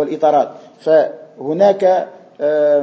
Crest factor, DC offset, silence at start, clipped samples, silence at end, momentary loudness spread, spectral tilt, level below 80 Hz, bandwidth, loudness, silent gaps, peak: 14 dB; under 0.1%; 0 s; under 0.1%; 0 s; 12 LU; -6.5 dB/octave; -74 dBFS; 7.8 kHz; -15 LUFS; none; 0 dBFS